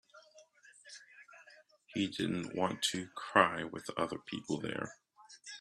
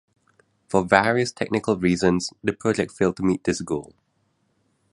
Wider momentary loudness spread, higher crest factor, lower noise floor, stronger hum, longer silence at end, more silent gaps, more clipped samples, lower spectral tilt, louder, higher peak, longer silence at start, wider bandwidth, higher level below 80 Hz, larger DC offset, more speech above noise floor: first, 24 LU vs 8 LU; first, 30 dB vs 24 dB; second, -62 dBFS vs -69 dBFS; neither; second, 0 s vs 1.05 s; neither; neither; second, -4 dB/octave vs -5.5 dB/octave; second, -35 LUFS vs -23 LUFS; second, -8 dBFS vs 0 dBFS; second, 0.15 s vs 0.7 s; first, 13.5 kHz vs 11.5 kHz; second, -74 dBFS vs -52 dBFS; neither; second, 27 dB vs 47 dB